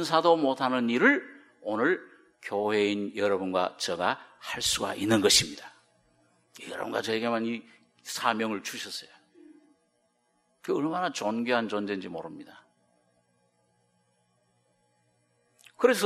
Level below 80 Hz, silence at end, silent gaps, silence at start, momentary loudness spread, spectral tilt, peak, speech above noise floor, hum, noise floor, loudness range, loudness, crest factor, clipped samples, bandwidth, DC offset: -66 dBFS; 0 s; none; 0 s; 17 LU; -3 dB/octave; -6 dBFS; 44 dB; none; -72 dBFS; 8 LU; -28 LUFS; 24 dB; under 0.1%; 15 kHz; under 0.1%